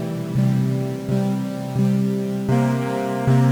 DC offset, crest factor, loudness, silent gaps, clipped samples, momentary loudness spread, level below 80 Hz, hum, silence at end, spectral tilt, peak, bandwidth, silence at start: under 0.1%; 12 dB; -21 LUFS; none; under 0.1%; 5 LU; -52 dBFS; none; 0 s; -8 dB/octave; -6 dBFS; 19 kHz; 0 s